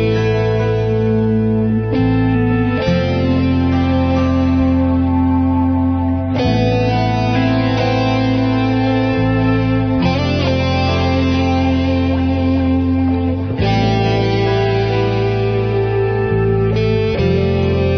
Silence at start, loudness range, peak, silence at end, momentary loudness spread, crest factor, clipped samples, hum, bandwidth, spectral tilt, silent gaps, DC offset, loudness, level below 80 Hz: 0 s; 1 LU; -2 dBFS; 0 s; 2 LU; 12 dB; under 0.1%; none; 6.4 kHz; -8 dB/octave; none; under 0.1%; -15 LUFS; -30 dBFS